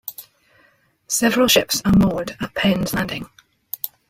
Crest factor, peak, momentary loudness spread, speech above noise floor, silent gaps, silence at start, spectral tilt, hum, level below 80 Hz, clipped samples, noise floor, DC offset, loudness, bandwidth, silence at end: 18 dB; -2 dBFS; 19 LU; 40 dB; none; 0.05 s; -4 dB/octave; none; -42 dBFS; under 0.1%; -59 dBFS; under 0.1%; -19 LUFS; 16.5 kHz; 0.25 s